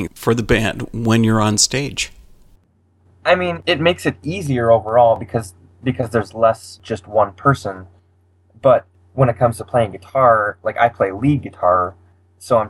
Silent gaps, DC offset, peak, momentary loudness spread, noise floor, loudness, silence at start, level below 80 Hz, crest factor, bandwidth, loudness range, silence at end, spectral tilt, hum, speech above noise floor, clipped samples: none; under 0.1%; 0 dBFS; 11 LU; -57 dBFS; -17 LUFS; 0 s; -42 dBFS; 18 dB; 15.5 kHz; 2 LU; 0 s; -5 dB/octave; none; 41 dB; under 0.1%